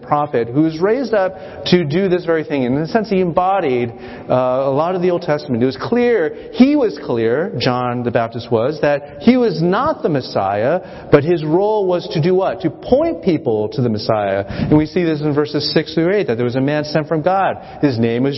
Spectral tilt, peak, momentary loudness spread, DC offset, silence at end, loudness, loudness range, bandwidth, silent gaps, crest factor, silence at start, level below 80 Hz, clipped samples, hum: -8 dB/octave; 0 dBFS; 4 LU; under 0.1%; 0 s; -17 LUFS; 1 LU; 6 kHz; none; 16 dB; 0 s; -46 dBFS; under 0.1%; none